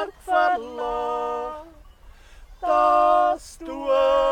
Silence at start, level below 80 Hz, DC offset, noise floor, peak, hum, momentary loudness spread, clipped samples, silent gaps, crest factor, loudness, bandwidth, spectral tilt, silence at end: 0 s; -48 dBFS; under 0.1%; -47 dBFS; -8 dBFS; none; 14 LU; under 0.1%; none; 14 dB; -22 LUFS; 13 kHz; -4 dB/octave; 0 s